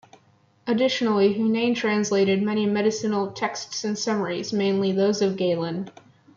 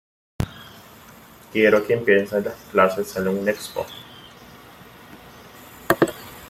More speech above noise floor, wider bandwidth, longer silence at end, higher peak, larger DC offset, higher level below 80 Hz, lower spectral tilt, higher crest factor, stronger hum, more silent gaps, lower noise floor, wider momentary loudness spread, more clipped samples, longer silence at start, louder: first, 37 dB vs 26 dB; second, 7.4 kHz vs 16.5 kHz; first, 0.45 s vs 0 s; second, -10 dBFS vs 0 dBFS; neither; second, -70 dBFS vs -52 dBFS; about the same, -5 dB/octave vs -5.5 dB/octave; second, 14 dB vs 24 dB; neither; neither; first, -60 dBFS vs -46 dBFS; second, 8 LU vs 25 LU; neither; first, 0.65 s vs 0.4 s; about the same, -23 LUFS vs -21 LUFS